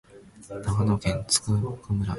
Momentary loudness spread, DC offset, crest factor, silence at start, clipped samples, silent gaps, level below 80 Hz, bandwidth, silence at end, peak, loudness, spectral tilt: 9 LU; under 0.1%; 22 dB; 0.15 s; under 0.1%; none; -42 dBFS; 11.5 kHz; 0 s; -4 dBFS; -26 LUFS; -4.5 dB/octave